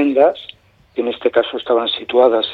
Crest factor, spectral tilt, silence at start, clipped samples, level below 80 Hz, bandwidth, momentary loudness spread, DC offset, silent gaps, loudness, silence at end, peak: 14 dB; -6 dB/octave; 0 s; under 0.1%; -58 dBFS; 4.8 kHz; 14 LU; under 0.1%; none; -16 LUFS; 0 s; -2 dBFS